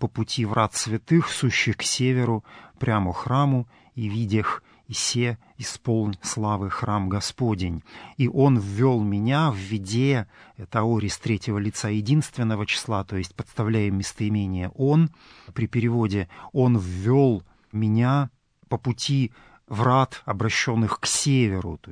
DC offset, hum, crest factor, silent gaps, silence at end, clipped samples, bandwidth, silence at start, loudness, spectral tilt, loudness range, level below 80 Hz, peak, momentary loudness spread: under 0.1%; none; 18 dB; none; 0 s; under 0.1%; 11 kHz; 0 s; -24 LUFS; -5.5 dB/octave; 3 LU; -52 dBFS; -6 dBFS; 10 LU